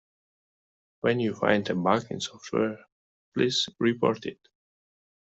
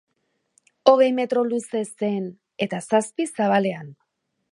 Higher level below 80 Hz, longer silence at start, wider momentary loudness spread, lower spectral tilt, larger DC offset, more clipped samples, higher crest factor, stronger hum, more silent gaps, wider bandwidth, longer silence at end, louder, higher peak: first, -68 dBFS vs -76 dBFS; first, 1.05 s vs 0.85 s; about the same, 10 LU vs 12 LU; about the same, -5 dB/octave vs -5 dB/octave; neither; neither; about the same, 24 dB vs 22 dB; neither; first, 2.92-3.32 s vs none; second, 8.2 kHz vs 11.5 kHz; first, 0.9 s vs 0.6 s; second, -27 LUFS vs -22 LUFS; second, -6 dBFS vs -2 dBFS